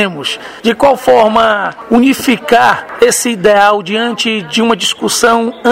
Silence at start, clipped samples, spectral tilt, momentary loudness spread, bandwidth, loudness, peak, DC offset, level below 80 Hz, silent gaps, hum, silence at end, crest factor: 0 s; 0.8%; -3 dB/octave; 7 LU; 16.5 kHz; -10 LUFS; 0 dBFS; under 0.1%; -46 dBFS; none; none; 0 s; 10 dB